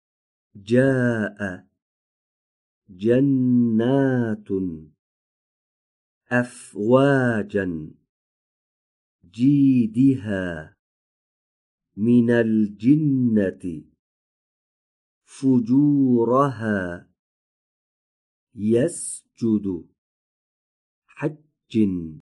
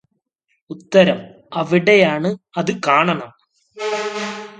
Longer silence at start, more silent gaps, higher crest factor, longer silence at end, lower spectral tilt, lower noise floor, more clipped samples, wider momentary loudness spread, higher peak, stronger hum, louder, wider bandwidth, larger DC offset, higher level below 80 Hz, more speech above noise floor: second, 0.55 s vs 0.7 s; first, 1.82-2.82 s, 4.99-6.21 s, 8.09-9.19 s, 10.79-11.78 s, 13.99-15.21 s, 17.19-18.47 s, 19.98-21.02 s vs none; about the same, 18 dB vs 18 dB; about the same, 0.05 s vs 0.05 s; first, -7.5 dB/octave vs -5.5 dB/octave; first, under -90 dBFS vs -70 dBFS; neither; about the same, 14 LU vs 15 LU; second, -4 dBFS vs 0 dBFS; neither; second, -21 LUFS vs -17 LUFS; first, 11.5 kHz vs 9.2 kHz; neither; about the same, -60 dBFS vs -64 dBFS; first, over 70 dB vs 53 dB